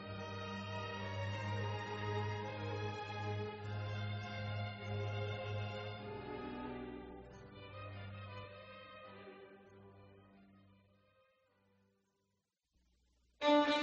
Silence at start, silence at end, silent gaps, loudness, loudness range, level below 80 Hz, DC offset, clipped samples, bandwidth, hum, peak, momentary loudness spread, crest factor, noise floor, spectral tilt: 0 s; 0 s; none; -42 LUFS; 15 LU; -68 dBFS; under 0.1%; under 0.1%; 7.6 kHz; none; -20 dBFS; 14 LU; 22 dB; -86 dBFS; -4.5 dB/octave